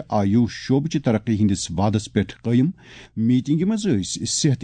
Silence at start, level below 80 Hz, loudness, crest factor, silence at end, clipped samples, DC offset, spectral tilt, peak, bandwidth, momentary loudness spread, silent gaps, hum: 0 s; -50 dBFS; -21 LUFS; 14 dB; 0 s; under 0.1%; under 0.1%; -5.5 dB/octave; -6 dBFS; 9.4 kHz; 5 LU; none; none